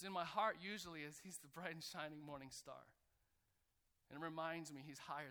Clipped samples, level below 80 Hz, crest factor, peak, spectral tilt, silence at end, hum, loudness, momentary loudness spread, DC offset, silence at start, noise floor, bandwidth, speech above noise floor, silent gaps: under 0.1%; -82 dBFS; 24 dB; -28 dBFS; -3.5 dB/octave; 0 s; none; -49 LUFS; 13 LU; under 0.1%; 0 s; -84 dBFS; over 20 kHz; 35 dB; none